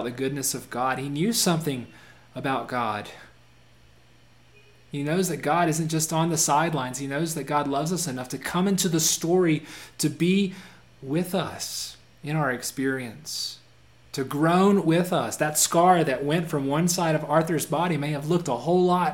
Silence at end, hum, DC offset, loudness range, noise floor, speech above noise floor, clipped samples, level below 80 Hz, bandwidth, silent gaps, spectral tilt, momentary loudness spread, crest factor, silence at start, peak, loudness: 0 s; none; 0.1%; 7 LU; -57 dBFS; 32 dB; under 0.1%; -62 dBFS; 17 kHz; none; -4.5 dB/octave; 12 LU; 18 dB; 0 s; -6 dBFS; -25 LUFS